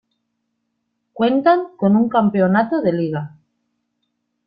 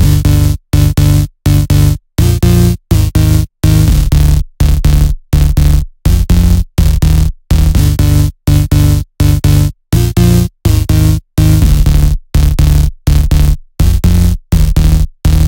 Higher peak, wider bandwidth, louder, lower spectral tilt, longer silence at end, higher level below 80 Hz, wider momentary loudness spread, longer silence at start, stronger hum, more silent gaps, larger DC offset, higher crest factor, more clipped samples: second, -4 dBFS vs 0 dBFS; second, 5.2 kHz vs 17.5 kHz; second, -17 LUFS vs -11 LUFS; first, -11.5 dB/octave vs -6.5 dB/octave; first, 1.2 s vs 0 s; second, -62 dBFS vs -12 dBFS; first, 8 LU vs 4 LU; first, 1.15 s vs 0 s; neither; neither; second, under 0.1% vs 0.5%; first, 16 dB vs 8 dB; neither